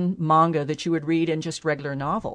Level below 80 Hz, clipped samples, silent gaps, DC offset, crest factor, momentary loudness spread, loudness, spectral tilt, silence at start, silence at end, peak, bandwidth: -56 dBFS; under 0.1%; none; under 0.1%; 16 dB; 8 LU; -23 LUFS; -6.5 dB/octave; 0 s; 0 s; -8 dBFS; 10 kHz